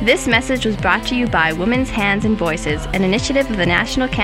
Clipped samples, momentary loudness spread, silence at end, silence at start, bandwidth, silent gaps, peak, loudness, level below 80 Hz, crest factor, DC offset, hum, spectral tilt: under 0.1%; 3 LU; 0 s; 0 s; 16 kHz; none; 0 dBFS; -17 LUFS; -30 dBFS; 16 dB; under 0.1%; none; -4.5 dB/octave